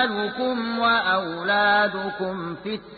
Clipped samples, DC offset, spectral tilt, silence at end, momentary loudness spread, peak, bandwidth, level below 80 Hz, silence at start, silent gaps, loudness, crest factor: under 0.1%; under 0.1%; -9 dB/octave; 0 s; 11 LU; -10 dBFS; 4.8 kHz; -60 dBFS; 0 s; none; -23 LUFS; 14 dB